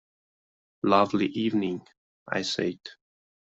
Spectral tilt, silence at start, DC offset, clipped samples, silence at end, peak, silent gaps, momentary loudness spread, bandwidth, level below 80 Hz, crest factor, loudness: -5 dB/octave; 0.85 s; under 0.1%; under 0.1%; 0.5 s; -6 dBFS; 1.97-2.26 s; 16 LU; 8.2 kHz; -68 dBFS; 24 dB; -27 LUFS